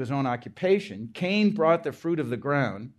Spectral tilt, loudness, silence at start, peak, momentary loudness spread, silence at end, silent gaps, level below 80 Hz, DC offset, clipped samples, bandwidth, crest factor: -7.5 dB/octave; -26 LUFS; 0 s; -8 dBFS; 7 LU; 0.1 s; none; -70 dBFS; under 0.1%; under 0.1%; 12 kHz; 18 dB